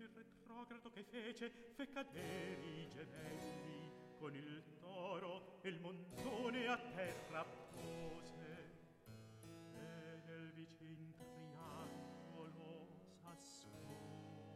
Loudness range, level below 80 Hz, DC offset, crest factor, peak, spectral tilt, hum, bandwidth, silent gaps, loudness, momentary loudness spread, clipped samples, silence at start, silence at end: 9 LU; -78 dBFS; under 0.1%; 22 dB; -30 dBFS; -5 dB/octave; none; 15.5 kHz; none; -52 LUFS; 12 LU; under 0.1%; 0 s; 0 s